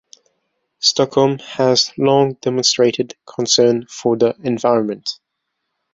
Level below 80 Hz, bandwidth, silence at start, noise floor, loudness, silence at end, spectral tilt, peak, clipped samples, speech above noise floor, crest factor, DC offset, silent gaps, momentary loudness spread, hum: -60 dBFS; 8 kHz; 0.8 s; -75 dBFS; -16 LUFS; 0.8 s; -4 dB/octave; -2 dBFS; under 0.1%; 59 dB; 16 dB; under 0.1%; none; 11 LU; none